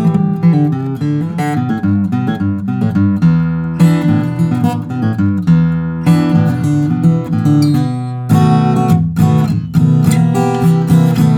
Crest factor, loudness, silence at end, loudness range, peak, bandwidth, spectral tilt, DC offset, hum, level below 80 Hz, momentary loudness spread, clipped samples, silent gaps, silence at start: 12 dB; -13 LUFS; 0 s; 2 LU; 0 dBFS; 14.5 kHz; -8.5 dB/octave; under 0.1%; none; -44 dBFS; 6 LU; under 0.1%; none; 0 s